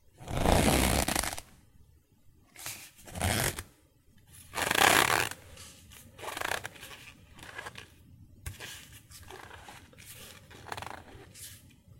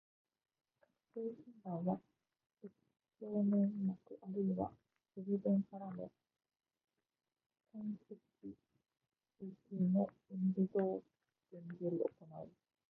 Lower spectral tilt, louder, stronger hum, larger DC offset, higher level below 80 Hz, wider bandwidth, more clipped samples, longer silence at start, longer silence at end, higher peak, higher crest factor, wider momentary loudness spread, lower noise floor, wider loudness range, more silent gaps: second, -3 dB/octave vs -12 dB/octave; first, -29 LUFS vs -40 LUFS; neither; neither; first, -44 dBFS vs -80 dBFS; first, 17 kHz vs 2.1 kHz; neither; second, 0.2 s vs 1.15 s; about the same, 0.4 s vs 0.4 s; first, -4 dBFS vs -24 dBFS; first, 28 dB vs 18 dB; first, 25 LU vs 20 LU; second, -62 dBFS vs -80 dBFS; first, 17 LU vs 13 LU; second, none vs 7.46-7.50 s